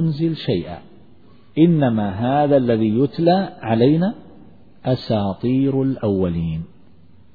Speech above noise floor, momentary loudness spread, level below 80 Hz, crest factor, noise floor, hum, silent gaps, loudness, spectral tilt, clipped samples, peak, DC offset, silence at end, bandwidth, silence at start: 33 dB; 13 LU; -48 dBFS; 16 dB; -51 dBFS; none; none; -19 LUFS; -10.5 dB/octave; under 0.1%; -2 dBFS; 0.5%; 0.7 s; 4.9 kHz; 0 s